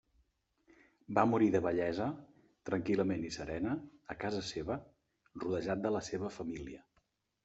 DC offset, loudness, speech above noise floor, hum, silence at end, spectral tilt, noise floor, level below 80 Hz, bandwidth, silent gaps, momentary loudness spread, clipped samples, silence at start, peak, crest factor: under 0.1%; -36 LUFS; 43 dB; none; 0.65 s; -6 dB/octave; -78 dBFS; -64 dBFS; 8.2 kHz; none; 16 LU; under 0.1%; 1.1 s; -12 dBFS; 24 dB